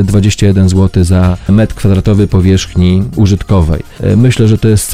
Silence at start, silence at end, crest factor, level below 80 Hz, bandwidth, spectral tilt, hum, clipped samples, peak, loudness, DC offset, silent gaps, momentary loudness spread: 0 s; 0 s; 8 dB; -22 dBFS; 15.5 kHz; -6.5 dB/octave; none; 0.9%; 0 dBFS; -9 LUFS; 2%; none; 3 LU